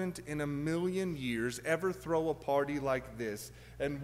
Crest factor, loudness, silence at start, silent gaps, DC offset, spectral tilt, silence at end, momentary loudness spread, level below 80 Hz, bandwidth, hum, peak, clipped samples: 16 dB; -35 LUFS; 0 s; none; under 0.1%; -5.5 dB/octave; 0 s; 7 LU; -58 dBFS; 16 kHz; none; -18 dBFS; under 0.1%